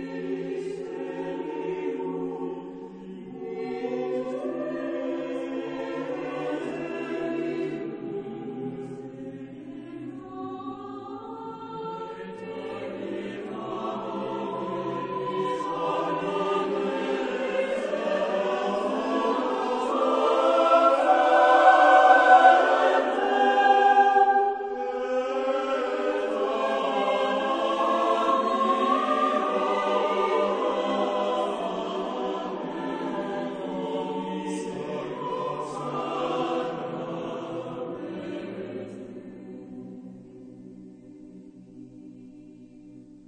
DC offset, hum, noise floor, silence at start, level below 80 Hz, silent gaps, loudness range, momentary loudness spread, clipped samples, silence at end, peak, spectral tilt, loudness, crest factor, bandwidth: under 0.1%; none; -48 dBFS; 0 s; -66 dBFS; none; 19 LU; 19 LU; under 0.1%; 0.1 s; -4 dBFS; -5 dB/octave; -25 LUFS; 22 dB; 9.6 kHz